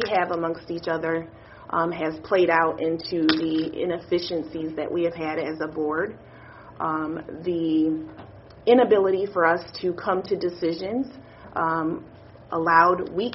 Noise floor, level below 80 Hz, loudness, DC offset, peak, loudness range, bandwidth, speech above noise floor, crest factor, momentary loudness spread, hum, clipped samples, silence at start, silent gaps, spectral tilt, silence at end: -45 dBFS; -58 dBFS; -24 LUFS; under 0.1%; -4 dBFS; 5 LU; 6 kHz; 21 dB; 22 dB; 12 LU; none; under 0.1%; 0 s; none; -3.5 dB/octave; 0 s